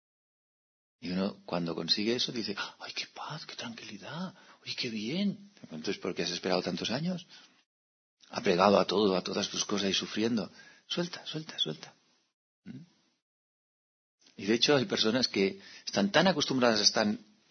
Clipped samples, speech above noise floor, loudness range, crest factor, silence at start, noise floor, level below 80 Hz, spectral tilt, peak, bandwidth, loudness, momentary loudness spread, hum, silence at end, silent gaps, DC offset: under 0.1%; over 59 dB; 9 LU; 26 dB; 1 s; under -90 dBFS; -74 dBFS; -4 dB/octave; -8 dBFS; 6.6 kHz; -30 LUFS; 16 LU; none; 0.3 s; 7.66-8.17 s, 12.33-12.62 s, 13.22-14.18 s; under 0.1%